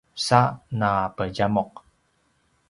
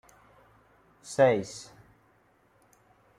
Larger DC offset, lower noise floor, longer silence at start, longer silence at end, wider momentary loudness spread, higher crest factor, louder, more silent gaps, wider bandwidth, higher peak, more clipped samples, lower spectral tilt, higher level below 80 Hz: neither; about the same, -67 dBFS vs -65 dBFS; second, 0.15 s vs 1.05 s; second, 1 s vs 1.55 s; second, 8 LU vs 27 LU; about the same, 24 dB vs 22 dB; first, -23 LUFS vs -26 LUFS; neither; about the same, 11.5 kHz vs 12 kHz; first, -2 dBFS vs -10 dBFS; neither; about the same, -5.5 dB/octave vs -5 dB/octave; first, -52 dBFS vs -70 dBFS